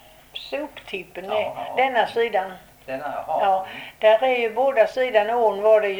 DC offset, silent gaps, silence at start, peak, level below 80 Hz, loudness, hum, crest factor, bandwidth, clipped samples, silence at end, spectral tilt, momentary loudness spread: under 0.1%; none; 0.35 s; -4 dBFS; -60 dBFS; -22 LUFS; none; 16 dB; over 20 kHz; under 0.1%; 0 s; -4 dB/octave; 16 LU